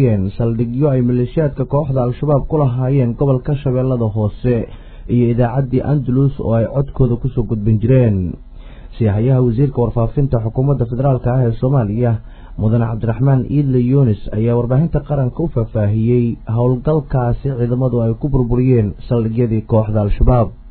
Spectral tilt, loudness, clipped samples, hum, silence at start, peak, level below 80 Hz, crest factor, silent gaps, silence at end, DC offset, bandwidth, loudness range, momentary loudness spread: -14.5 dB/octave; -16 LUFS; under 0.1%; none; 0 s; 0 dBFS; -28 dBFS; 14 dB; none; 0 s; under 0.1%; 4.3 kHz; 1 LU; 5 LU